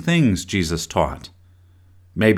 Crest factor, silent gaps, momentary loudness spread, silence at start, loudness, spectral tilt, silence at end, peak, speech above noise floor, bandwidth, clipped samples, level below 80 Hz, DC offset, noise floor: 18 dB; none; 18 LU; 0 s; -21 LUFS; -5.5 dB/octave; 0 s; -2 dBFS; 31 dB; 15.5 kHz; under 0.1%; -40 dBFS; under 0.1%; -51 dBFS